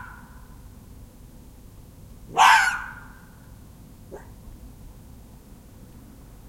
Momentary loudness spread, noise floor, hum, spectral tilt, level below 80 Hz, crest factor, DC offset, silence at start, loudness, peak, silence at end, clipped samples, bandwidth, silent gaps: 31 LU; -46 dBFS; none; -1.5 dB/octave; -48 dBFS; 26 dB; under 0.1%; 0 s; -18 LUFS; -2 dBFS; 2 s; under 0.1%; 16.5 kHz; none